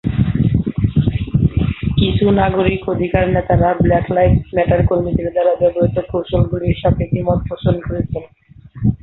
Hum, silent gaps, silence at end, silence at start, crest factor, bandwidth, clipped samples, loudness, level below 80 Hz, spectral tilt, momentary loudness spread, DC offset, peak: none; none; 0.05 s; 0.05 s; 14 dB; 4.1 kHz; under 0.1%; -16 LUFS; -28 dBFS; -11.5 dB/octave; 6 LU; under 0.1%; -2 dBFS